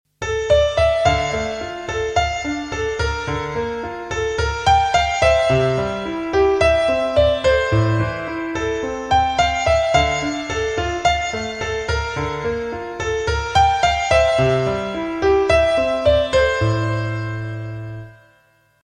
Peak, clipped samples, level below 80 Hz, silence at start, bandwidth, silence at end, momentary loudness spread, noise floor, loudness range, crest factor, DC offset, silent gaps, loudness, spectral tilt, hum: -2 dBFS; under 0.1%; -34 dBFS; 0.2 s; 10 kHz; 0.7 s; 10 LU; -57 dBFS; 4 LU; 16 dB; under 0.1%; none; -19 LUFS; -5 dB/octave; none